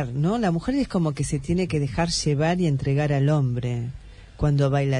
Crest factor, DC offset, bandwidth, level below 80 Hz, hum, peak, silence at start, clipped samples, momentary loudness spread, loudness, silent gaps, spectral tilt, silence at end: 14 dB; under 0.1%; 10.5 kHz; -42 dBFS; none; -8 dBFS; 0 s; under 0.1%; 6 LU; -23 LUFS; none; -6.5 dB/octave; 0 s